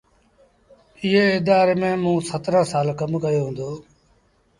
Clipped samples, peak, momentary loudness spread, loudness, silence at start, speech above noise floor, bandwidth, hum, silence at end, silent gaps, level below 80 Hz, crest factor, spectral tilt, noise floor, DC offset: under 0.1%; -4 dBFS; 11 LU; -20 LUFS; 1 s; 41 dB; 11.5 kHz; none; 0.8 s; none; -56 dBFS; 16 dB; -6 dB/octave; -60 dBFS; under 0.1%